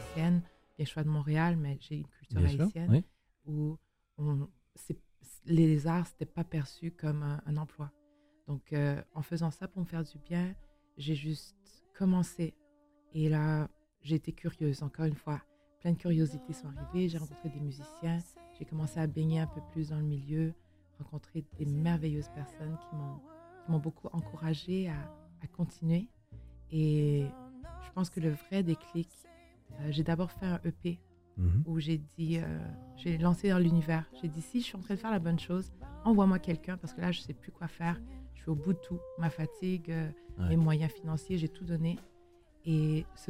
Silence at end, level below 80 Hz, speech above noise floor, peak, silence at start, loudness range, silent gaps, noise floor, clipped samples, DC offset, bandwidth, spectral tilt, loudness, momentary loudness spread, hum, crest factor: 0.05 s; -54 dBFS; 35 dB; -14 dBFS; 0 s; 5 LU; none; -68 dBFS; under 0.1%; under 0.1%; 13.5 kHz; -8 dB/octave; -34 LUFS; 15 LU; none; 20 dB